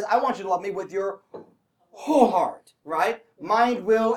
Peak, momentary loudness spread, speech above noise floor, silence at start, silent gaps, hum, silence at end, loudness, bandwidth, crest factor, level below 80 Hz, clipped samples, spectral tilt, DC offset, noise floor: -4 dBFS; 15 LU; 38 dB; 0 s; none; none; 0 s; -24 LUFS; 16.5 kHz; 20 dB; -70 dBFS; under 0.1%; -5 dB/octave; under 0.1%; -61 dBFS